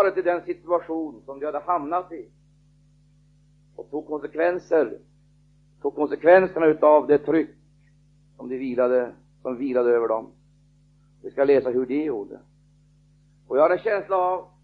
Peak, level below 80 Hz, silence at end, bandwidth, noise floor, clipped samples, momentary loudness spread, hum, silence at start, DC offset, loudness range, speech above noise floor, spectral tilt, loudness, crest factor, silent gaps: -2 dBFS; -62 dBFS; 0.2 s; 6 kHz; -58 dBFS; under 0.1%; 18 LU; 50 Hz at -55 dBFS; 0 s; under 0.1%; 9 LU; 36 dB; -8 dB/octave; -23 LUFS; 22 dB; none